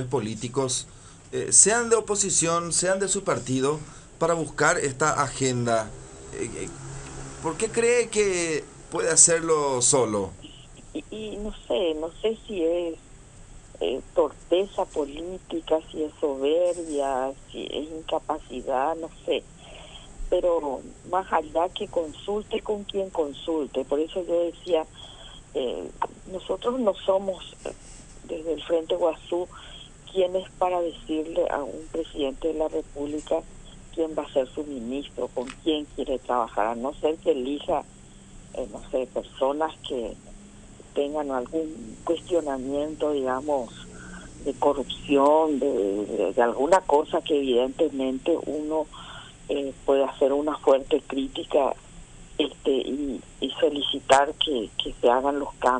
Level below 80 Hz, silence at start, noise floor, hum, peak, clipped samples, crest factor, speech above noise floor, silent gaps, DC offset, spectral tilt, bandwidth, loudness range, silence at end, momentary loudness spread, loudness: -48 dBFS; 0 s; -47 dBFS; none; 0 dBFS; under 0.1%; 26 dB; 21 dB; none; under 0.1%; -3 dB/octave; 11 kHz; 8 LU; 0 s; 15 LU; -25 LUFS